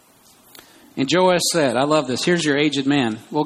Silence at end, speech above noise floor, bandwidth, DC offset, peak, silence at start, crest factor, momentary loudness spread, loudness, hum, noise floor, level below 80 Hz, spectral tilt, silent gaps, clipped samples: 0 s; 34 dB; 15 kHz; under 0.1%; -4 dBFS; 0.95 s; 16 dB; 6 LU; -18 LUFS; none; -52 dBFS; -60 dBFS; -4 dB/octave; none; under 0.1%